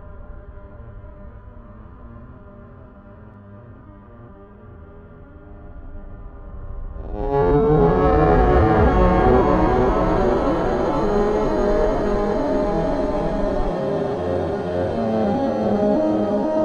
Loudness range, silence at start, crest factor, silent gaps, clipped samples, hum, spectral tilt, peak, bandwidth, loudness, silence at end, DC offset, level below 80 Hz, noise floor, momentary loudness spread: 8 LU; 0 s; 16 dB; none; under 0.1%; none; -8.5 dB/octave; -4 dBFS; 8.4 kHz; -19 LUFS; 0 s; under 0.1%; -28 dBFS; -42 dBFS; 25 LU